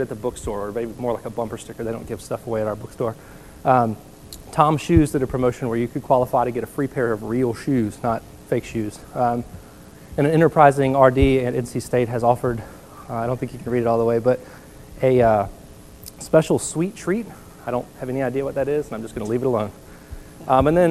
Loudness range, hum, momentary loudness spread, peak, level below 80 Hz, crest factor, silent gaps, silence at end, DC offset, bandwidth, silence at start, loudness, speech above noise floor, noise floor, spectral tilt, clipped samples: 7 LU; none; 15 LU; 0 dBFS; -40 dBFS; 22 dB; none; 0 s; 0.2%; 15 kHz; 0 s; -21 LUFS; 23 dB; -43 dBFS; -7 dB/octave; under 0.1%